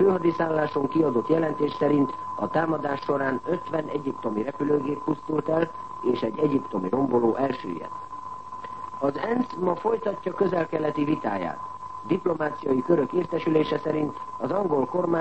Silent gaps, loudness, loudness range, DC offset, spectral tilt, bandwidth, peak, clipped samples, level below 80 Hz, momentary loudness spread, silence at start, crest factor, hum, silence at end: none; -26 LUFS; 2 LU; 0.4%; -8 dB/octave; 8.4 kHz; -8 dBFS; under 0.1%; -62 dBFS; 10 LU; 0 s; 18 dB; none; 0 s